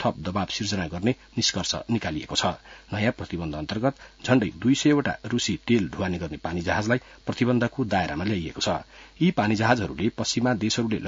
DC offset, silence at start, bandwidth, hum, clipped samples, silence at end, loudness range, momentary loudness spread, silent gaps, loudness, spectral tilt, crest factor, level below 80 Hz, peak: under 0.1%; 0 s; 7.8 kHz; none; under 0.1%; 0 s; 2 LU; 8 LU; none; -26 LUFS; -5 dB/octave; 20 dB; -52 dBFS; -6 dBFS